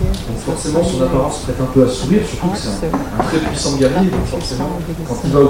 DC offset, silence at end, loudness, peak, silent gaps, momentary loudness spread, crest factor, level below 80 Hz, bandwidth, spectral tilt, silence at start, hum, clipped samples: 0.5%; 0 s; -17 LUFS; 0 dBFS; none; 7 LU; 16 dB; -28 dBFS; 16.5 kHz; -6 dB/octave; 0 s; none; under 0.1%